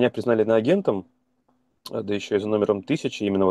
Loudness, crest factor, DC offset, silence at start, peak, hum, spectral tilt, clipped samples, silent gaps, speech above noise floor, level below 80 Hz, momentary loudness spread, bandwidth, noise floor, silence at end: -23 LUFS; 16 dB; under 0.1%; 0 s; -8 dBFS; none; -6.5 dB/octave; under 0.1%; none; 46 dB; -64 dBFS; 12 LU; 12.5 kHz; -68 dBFS; 0 s